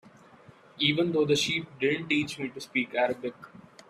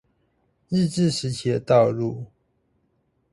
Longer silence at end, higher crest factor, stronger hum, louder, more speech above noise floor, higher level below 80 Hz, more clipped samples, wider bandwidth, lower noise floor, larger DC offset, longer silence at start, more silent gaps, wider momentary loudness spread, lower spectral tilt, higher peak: second, 0.3 s vs 1.05 s; about the same, 18 dB vs 18 dB; neither; second, -28 LUFS vs -22 LUFS; second, 26 dB vs 47 dB; second, -68 dBFS vs -58 dBFS; neither; first, 14.5 kHz vs 11.5 kHz; second, -54 dBFS vs -69 dBFS; neither; about the same, 0.75 s vs 0.7 s; neither; second, 10 LU vs 13 LU; second, -4 dB/octave vs -6.5 dB/octave; second, -10 dBFS vs -6 dBFS